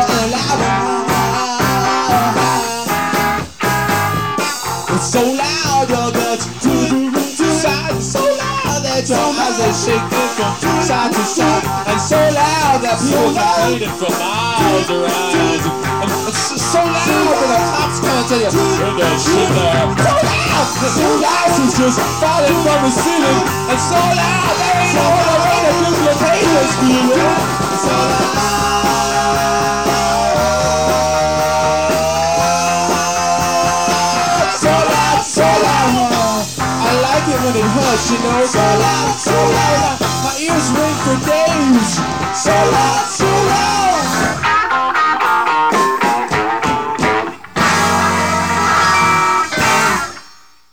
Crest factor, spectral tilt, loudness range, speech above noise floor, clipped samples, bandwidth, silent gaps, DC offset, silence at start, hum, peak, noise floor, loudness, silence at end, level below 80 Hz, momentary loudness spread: 12 dB; -4 dB/octave; 3 LU; 30 dB; under 0.1%; 18 kHz; none; 0.9%; 0 s; none; -2 dBFS; -44 dBFS; -14 LUFS; 0.5 s; -38 dBFS; 4 LU